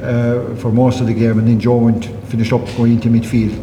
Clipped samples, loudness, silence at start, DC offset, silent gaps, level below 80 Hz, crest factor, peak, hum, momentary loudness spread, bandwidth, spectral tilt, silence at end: under 0.1%; -15 LUFS; 0 s; under 0.1%; none; -38 dBFS; 12 dB; -2 dBFS; none; 6 LU; 11 kHz; -8.5 dB/octave; 0 s